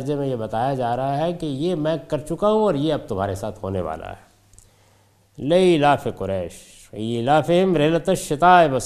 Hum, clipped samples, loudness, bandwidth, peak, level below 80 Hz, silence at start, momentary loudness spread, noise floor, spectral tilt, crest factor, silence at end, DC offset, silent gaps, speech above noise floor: none; under 0.1%; -21 LUFS; 14.5 kHz; -2 dBFS; -48 dBFS; 0 s; 13 LU; -57 dBFS; -6 dB/octave; 18 dB; 0 s; under 0.1%; none; 37 dB